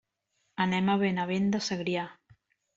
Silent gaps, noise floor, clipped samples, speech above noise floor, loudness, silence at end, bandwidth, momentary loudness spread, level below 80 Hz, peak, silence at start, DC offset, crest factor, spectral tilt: none; -77 dBFS; under 0.1%; 49 dB; -29 LUFS; 0.65 s; 7.8 kHz; 10 LU; -68 dBFS; -14 dBFS; 0.6 s; under 0.1%; 16 dB; -5.5 dB/octave